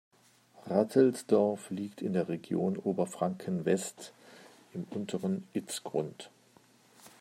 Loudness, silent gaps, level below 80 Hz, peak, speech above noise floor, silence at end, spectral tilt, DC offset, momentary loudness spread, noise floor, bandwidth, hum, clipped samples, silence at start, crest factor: -32 LUFS; none; -80 dBFS; -10 dBFS; 31 dB; 0.1 s; -6 dB/octave; under 0.1%; 18 LU; -63 dBFS; 16 kHz; none; under 0.1%; 0.65 s; 22 dB